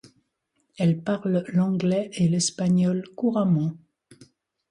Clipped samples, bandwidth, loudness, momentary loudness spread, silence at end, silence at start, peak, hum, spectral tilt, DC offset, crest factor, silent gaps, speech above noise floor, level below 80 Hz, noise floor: under 0.1%; 11 kHz; -24 LUFS; 4 LU; 0.95 s; 0.8 s; -12 dBFS; none; -6 dB/octave; under 0.1%; 14 dB; none; 51 dB; -64 dBFS; -73 dBFS